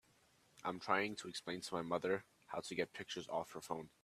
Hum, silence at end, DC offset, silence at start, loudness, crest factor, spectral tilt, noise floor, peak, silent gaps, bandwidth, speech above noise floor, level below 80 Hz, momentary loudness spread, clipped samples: none; 0.15 s; under 0.1%; 0.55 s; -43 LUFS; 26 dB; -4 dB/octave; -73 dBFS; -18 dBFS; none; 14.5 kHz; 30 dB; -80 dBFS; 9 LU; under 0.1%